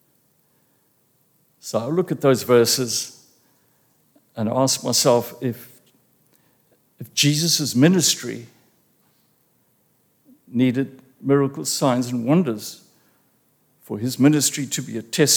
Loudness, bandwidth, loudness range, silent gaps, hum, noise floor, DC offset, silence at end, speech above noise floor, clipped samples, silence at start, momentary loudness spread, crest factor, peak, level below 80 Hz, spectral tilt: -20 LUFS; over 20 kHz; 3 LU; none; none; -64 dBFS; under 0.1%; 0 s; 44 dB; under 0.1%; 1.65 s; 15 LU; 20 dB; -2 dBFS; -72 dBFS; -4 dB/octave